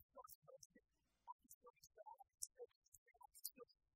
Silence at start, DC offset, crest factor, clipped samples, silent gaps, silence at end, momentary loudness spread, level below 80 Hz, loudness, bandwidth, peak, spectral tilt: 0 s; under 0.1%; 36 dB; under 0.1%; 0.03-0.09 s, 0.35-0.42 s, 0.65-0.70 s, 1.32-1.39 s, 1.54-1.61 s, 2.76-2.82 s, 2.88-2.92 s, 2.98-3.06 s; 0.25 s; 13 LU; under -90 dBFS; -60 LUFS; 16 kHz; -28 dBFS; -0.5 dB/octave